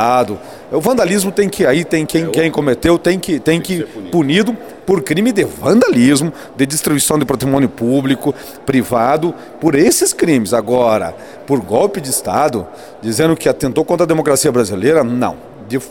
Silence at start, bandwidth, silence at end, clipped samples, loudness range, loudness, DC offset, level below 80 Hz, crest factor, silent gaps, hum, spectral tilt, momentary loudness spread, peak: 0 s; 18.5 kHz; 0 s; under 0.1%; 2 LU; -14 LUFS; 0.3%; -44 dBFS; 14 dB; none; none; -5 dB/octave; 9 LU; 0 dBFS